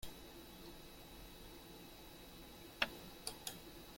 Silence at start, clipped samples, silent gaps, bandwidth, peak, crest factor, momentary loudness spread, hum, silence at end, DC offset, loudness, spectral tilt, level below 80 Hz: 0 s; under 0.1%; none; 16.5 kHz; -18 dBFS; 32 dB; 14 LU; none; 0 s; under 0.1%; -49 LUFS; -2.5 dB/octave; -62 dBFS